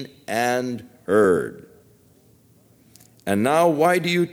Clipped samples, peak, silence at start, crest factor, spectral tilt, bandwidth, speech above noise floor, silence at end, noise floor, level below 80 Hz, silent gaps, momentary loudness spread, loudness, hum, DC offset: under 0.1%; -6 dBFS; 0 s; 18 dB; -5.5 dB/octave; over 20 kHz; 35 dB; 0 s; -55 dBFS; -62 dBFS; none; 15 LU; -20 LUFS; none; under 0.1%